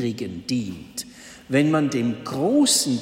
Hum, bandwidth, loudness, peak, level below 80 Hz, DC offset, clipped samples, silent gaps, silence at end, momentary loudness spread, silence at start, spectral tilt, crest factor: none; 16 kHz; -22 LUFS; -6 dBFS; -58 dBFS; under 0.1%; under 0.1%; none; 0 s; 17 LU; 0 s; -4 dB/octave; 16 dB